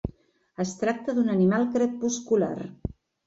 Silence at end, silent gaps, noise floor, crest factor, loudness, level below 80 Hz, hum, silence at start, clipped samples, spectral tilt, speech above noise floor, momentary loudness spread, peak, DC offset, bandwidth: 0.35 s; none; -53 dBFS; 14 dB; -26 LUFS; -50 dBFS; none; 0.05 s; under 0.1%; -6 dB/octave; 28 dB; 16 LU; -12 dBFS; under 0.1%; 8 kHz